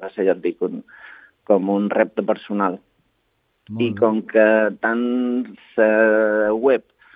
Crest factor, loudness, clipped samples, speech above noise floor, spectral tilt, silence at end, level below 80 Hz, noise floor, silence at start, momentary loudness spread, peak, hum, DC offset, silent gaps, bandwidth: 18 dB; -19 LUFS; under 0.1%; 49 dB; -9.5 dB/octave; 0.35 s; -68 dBFS; -68 dBFS; 0 s; 11 LU; -2 dBFS; none; under 0.1%; none; 4.6 kHz